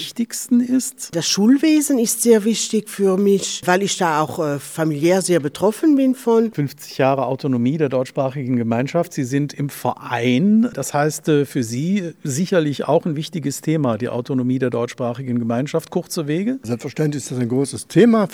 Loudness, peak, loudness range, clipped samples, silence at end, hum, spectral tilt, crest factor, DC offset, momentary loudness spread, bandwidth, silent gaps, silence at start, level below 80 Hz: -19 LUFS; -2 dBFS; 5 LU; under 0.1%; 0 s; none; -5 dB/octave; 16 dB; under 0.1%; 9 LU; 18 kHz; none; 0 s; -66 dBFS